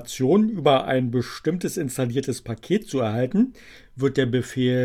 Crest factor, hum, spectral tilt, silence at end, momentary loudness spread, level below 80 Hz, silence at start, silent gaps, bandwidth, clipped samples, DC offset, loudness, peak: 16 dB; none; -6 dB/octave; 0 s; 7 LU; -54 dBFS; 0 s; none; 16 kHz; under 0.1%; under 0.1%; -23 LUFS; -6 dBFS